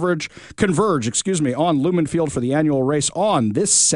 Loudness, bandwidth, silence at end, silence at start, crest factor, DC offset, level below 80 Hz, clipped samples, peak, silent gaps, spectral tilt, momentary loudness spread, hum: -19 LUFS; 11 kHz; 0 s; 0 s; 16 dB; under 0.1%; -50 dBFS; under 0.1%; -4 dBFS; none; -4 dB/octave; 5 LU; none